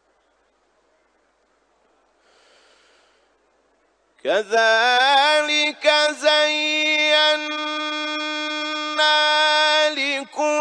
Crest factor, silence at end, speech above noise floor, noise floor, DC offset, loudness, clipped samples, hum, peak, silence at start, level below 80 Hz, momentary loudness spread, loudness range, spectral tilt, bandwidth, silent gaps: 18 dB; 0 s; 46 dB; -64 dBFS; under 0.1%; -18 LUFS; under 0.1%; none; -4 dBFS; 4.25 s; -78 dBFS; 9 LU; 7 LU; 0.5 dB/octave; 10.5 kHz; none